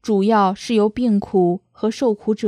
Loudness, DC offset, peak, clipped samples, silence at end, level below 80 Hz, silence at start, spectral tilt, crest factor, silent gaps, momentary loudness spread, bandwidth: -18 LUFS; under 0.1%; -4 dBFS; under 0.1%; 0 s; -54 dBFS; 0.05 s; -7 dB/octave; 14 dB; none; 4 LU; 10.5 kHz